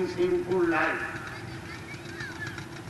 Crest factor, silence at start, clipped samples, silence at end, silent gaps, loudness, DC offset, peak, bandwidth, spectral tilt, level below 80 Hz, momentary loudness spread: 16 dB; 0 s; under 0.1%; 0 s; none; -30 LUFS; under 0.1%; -14 dBFS; 12 kHz; -6 dB/octave; -56 dBFS; 14 LU